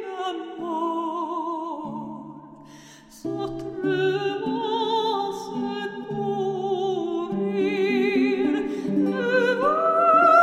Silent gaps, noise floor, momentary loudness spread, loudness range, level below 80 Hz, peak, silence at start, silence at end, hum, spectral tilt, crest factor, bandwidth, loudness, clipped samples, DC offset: none; -47 dBFS; 12 LU; 8 LU; -62 dBFS; -4 dBFS; 0 s; 0 s; none; -6 dB/octave; 20 dB; 12.5 kHz; -24 LUFS; under 0.1%; under 0.1%